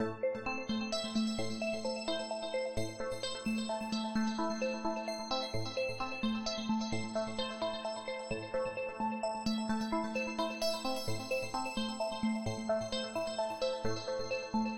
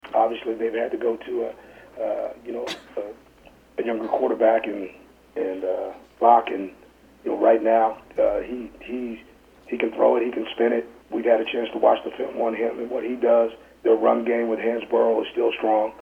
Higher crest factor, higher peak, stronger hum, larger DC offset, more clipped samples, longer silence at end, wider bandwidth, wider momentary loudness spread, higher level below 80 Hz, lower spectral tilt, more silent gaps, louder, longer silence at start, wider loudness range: second, 14 dB vs 20 dB; second, -22 dBFS vs -2 dBFS; neither; neither; neither; about the same, 0 s vs 0.05 s; first, 16 kHz vs 8.4 kHz; second, 3 LU vs 14 LU; about the same, -58 dBFS vs -60 dBFS; about the same, -4.5 dB/octave vs -5.5 dB/octave; neither; second, -36 LUFS vs -23 LUFS; about the same, 0 s vs 0.05 s; second, 1 LU vs 5 LU